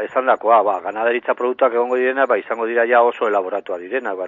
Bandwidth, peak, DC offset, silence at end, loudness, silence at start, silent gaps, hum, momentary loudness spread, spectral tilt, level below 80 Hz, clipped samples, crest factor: 7.4 kHz; 0 dBFS; under 0.1%; 0 s; -18 LUFS; 0 s; none; none; 9 LU; -5.5 dB/octave; -76 dBFS; under 0.1%; 16 dB